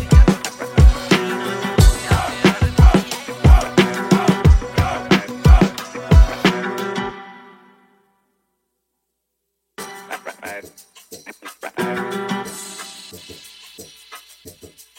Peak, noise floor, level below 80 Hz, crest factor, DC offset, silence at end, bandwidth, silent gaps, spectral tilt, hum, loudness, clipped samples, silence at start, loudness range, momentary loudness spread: -2 dBFS; -75 dBFS; -20 dBFS; 16 dB; under 0.1%; 0.3 s; 16.5 kHz; none; -6 dB/octave; none; -16 LUFS; under 0.1%; 0 s; 20 LU; 23 LU